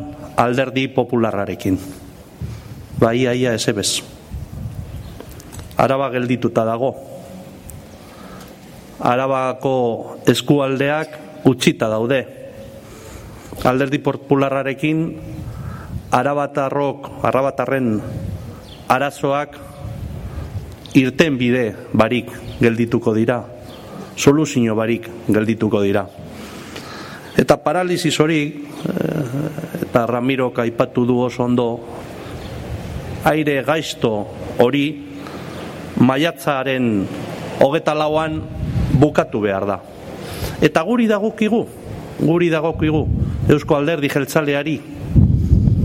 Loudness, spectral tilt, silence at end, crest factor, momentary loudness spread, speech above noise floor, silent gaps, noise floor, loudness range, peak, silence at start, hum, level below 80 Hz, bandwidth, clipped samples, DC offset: -18 LUFS; -6 dB/octave; 0 s; 18 dB; 18 LU; 21 dB; none; -39 dBFS; 4 LU; 0 dBFS; 0 s; none; -36 dBFS; 16.5 kHz; under 0.1%; under 0.1%